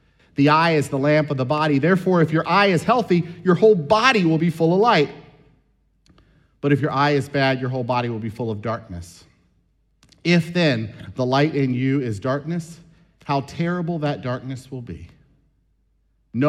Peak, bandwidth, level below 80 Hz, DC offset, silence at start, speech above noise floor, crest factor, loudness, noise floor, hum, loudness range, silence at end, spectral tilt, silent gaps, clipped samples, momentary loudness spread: -2 dBFS; 12.5 kHz; -56 dBFS; under 0.1%; 0.4 s; 45 dB; 18 dB; -20 LUFS; -64 dBFS; none; 9 LU; 0 s; -6.5 dB/octave; none; under 0.1%; 15 LU